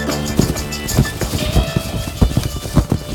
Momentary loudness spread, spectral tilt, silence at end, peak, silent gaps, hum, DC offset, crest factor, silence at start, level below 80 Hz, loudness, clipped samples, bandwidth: 4 LU; -5 dB/octave; 0 s; 0 dBFS; none; none; under 0.1%; 18 dB; 0 s; -24 dBFS; -18 LUFS; under 0.1%; 19 kHz